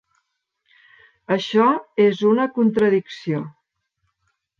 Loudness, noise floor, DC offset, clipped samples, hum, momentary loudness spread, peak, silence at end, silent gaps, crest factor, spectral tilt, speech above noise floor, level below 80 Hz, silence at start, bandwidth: -19 LUFS; -73 dBFS; under 0.1%; under 0.1%; none; 10 LU; -4 dBFS; 1.1 s; none; 18 dB; -7 dB/octave; 54 dB; -66 dBFS; 1.3 s; 7.2 kHz